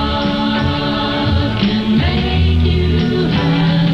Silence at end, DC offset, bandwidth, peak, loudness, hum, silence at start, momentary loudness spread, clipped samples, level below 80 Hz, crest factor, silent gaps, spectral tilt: 0 s; 0.3%; 6.8 kHz; -2 dBFS; -15 LUFS; none; 0 s; 3 LU; under 0.1%; -24 dBFS; 12 dB; none; -7.5 dB/octave